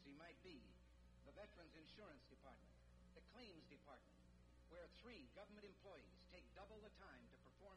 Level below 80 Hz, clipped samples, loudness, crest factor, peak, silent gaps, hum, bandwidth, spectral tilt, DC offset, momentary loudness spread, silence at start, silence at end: -72 dBFS; under 0.1%; -65 LUFS; 16 dB; -50 dBFS; none; 60 Hz at -75 dBFS; 10 kHz; -5.5 dB/octave; under 0.1%; 5 LU; 0 s; 0 s